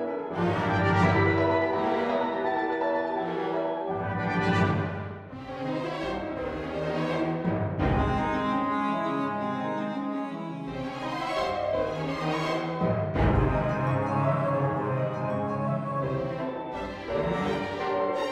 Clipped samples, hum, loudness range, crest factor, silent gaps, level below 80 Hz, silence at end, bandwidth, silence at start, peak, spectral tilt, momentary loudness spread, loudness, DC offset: under 0.1%; none; 4 LU; 18 dB; none; -44 dBFS; 0 s; 10.5 kHz; 0 s; -10 dBFS; -7.5 dB/octave; 9 LU; -28 LUFS; under 0.1%